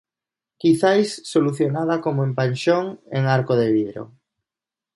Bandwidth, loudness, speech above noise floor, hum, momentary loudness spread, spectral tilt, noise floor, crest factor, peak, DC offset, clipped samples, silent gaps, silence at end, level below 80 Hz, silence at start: 11.5 kHz; -20 LUFS; 69 dB; none; 6 LU; -6.5 dB/octave; -89 dBFS; 16 dB; -4 dBFS; under 0.1%; under 0.1%; none; 0.9 s; -64 dBFS; 0.65 s